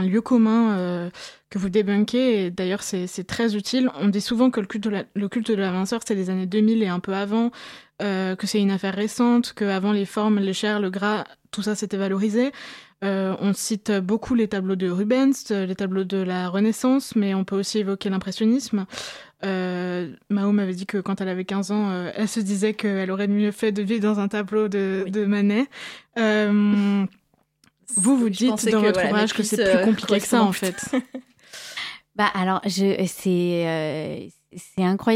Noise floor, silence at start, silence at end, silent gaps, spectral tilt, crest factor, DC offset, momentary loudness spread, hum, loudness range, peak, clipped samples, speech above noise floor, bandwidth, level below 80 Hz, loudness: -63 dBFS; 0 s; 0 s; none; -5 dB/octave; 16 dB; under 0.1%; 10 LU; none; 4 LU; -6 dBFS; under 0.1%; 41 dB; 15.5 kHz; -62 dBFS; -23 LUFS